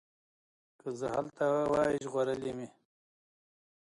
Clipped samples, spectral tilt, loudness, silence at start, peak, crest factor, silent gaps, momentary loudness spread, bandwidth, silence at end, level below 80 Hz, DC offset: under 0.1%; -6 dB/octave; -33 LUFS; 0.85 s; -18 dBFS; 16 dB; none; 15 LU; 11.5 kHz; 1.25 s; -66 dBFS; under 0.1%